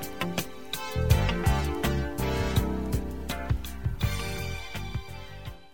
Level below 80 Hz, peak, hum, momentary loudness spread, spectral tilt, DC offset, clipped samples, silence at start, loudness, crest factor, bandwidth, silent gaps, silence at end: -34 dBFS; -8 dBFS; none; 11 LU; -5.5 dB/octave; 0.8%; under 0.1%; 0 s; -30 LUFS; 20 dB; 17.5 kHz; none; 0 s